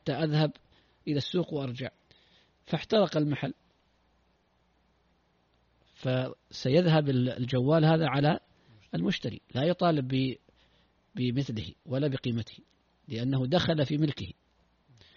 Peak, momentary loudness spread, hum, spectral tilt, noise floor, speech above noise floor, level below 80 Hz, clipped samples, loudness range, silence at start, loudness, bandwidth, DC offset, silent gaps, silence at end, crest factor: -10 dBFS; 13 LU; none; -6 dB/octave; -70 dBFS; 42 dB; -62 dBFS; under 0.1%; 7 LU; 0.05 s; -29 LUFS; 7 kHz; under 0.1%; none; 0.85 s; 20 dB